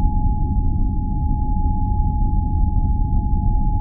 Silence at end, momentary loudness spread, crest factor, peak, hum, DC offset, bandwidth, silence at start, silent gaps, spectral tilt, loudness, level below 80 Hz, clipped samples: 0 s; 2 LU; 12 dB; -4 dBFS; none; under 0.1%; 1 kHz; 0 s; none; -16.5 dB/octave; -22 LUFS; -18 dBFS; under 0.1%